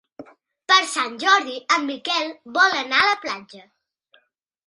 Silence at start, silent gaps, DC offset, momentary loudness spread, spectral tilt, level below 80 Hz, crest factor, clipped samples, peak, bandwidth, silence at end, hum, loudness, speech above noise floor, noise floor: 0.2 s; none; under 0.1%; 9 LU; 0 dB/octave; -68 dBFS; 20 dB; under 0.1%; -2 dBFS; 11.5 kHz; 1.05 s; none; -19 LUFS; 43 dB; -64 dBFS